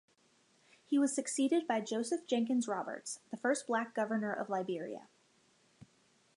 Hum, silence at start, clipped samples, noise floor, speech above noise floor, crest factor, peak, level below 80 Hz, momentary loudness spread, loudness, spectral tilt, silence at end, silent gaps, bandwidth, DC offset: none; 0.9 s; under 0.1%; -71 dBFS; 36 dB; 18 dB; -20 dBFS; -86 dBFS; 9 LU; -35 LUFS; -4 dB/octave; 0.5 s; none; 11.5 kHz; under 0.1%